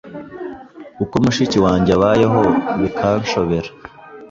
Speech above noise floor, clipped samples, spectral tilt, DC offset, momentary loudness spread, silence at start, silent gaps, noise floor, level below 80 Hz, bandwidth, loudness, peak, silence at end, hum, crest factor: 20 dB; under 0.1%; -6.5 dB/octave; under 0.1%; 18 LU; 0.05 s; none; -36 dBFS; -40 dBFS; 7.8 kHz; -16 LUFS; -2 dBFS; 0.05 s; none; 16 dB